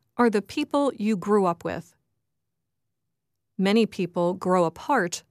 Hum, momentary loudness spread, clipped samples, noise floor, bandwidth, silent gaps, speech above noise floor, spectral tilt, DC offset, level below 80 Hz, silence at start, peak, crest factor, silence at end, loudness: none; 7 LU; under 0.1%; -83 dBFS; 14.5 kHz; none; 59 dB; -5.5 dB/octave; under 0.1%; -66 dBFS; 0.15 s; -8 dBFS; 18 dB; 0.1 s; -24 LUFS